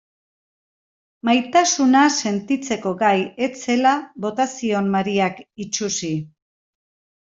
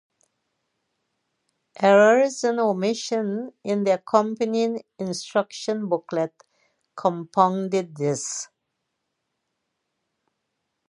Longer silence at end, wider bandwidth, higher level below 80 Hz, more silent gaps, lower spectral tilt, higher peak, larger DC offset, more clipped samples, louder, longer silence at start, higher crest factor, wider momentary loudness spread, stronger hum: second, 0.95 s vs 2.45 s; second, 7.8 kHz vs 11.5 kHz; first, -64 dBFS vs -78 dBFS; neither; second, -3.5 dB/octave vs -5 dB/octave; about the same, -4 dBFS vs -4 dBFS; neither; neither; first, -20 LUFS vs -23 LUFS; second, 1.25 s vs 1.8 s; about the same, 18 dB vs 20 dB; about the same, 11 LU vs 13 LU; neither